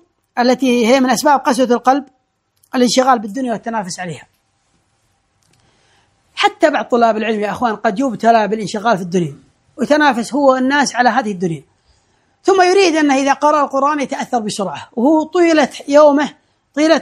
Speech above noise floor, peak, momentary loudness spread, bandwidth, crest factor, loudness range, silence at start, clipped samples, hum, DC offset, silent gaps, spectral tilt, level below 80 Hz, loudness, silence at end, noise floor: 48 dB; 0 dBFS; 11 LU; 16 kHz; 16 dB; 5 LU; 0.35 s; under 0.1%; none; under 0.1%; none; -4 dB/octave; -62 dBFS; -14 LUFS; 0 s; -62 dBFS